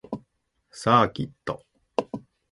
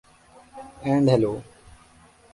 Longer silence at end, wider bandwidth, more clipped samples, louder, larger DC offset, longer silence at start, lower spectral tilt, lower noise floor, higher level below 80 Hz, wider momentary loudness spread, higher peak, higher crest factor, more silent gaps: second, 0.35 s vs 0.9 s; about the same, 11.5 kHz vs 11.5 kHz; neither; second, -25 LUFS vs -22 LUFS; neither; second, 0.1 s vs 0.55 s; second, -6 dB/octave vs -8 dB/octave; first, -71 dBFS vs -54 dBFS; about the same, -58 dBFS vs -56 dBFS; second, 19 LU vs 24 LU; about the same, -4 dBFS vs -6 dBFS; about the same, 24 dB vs 20 dB; neither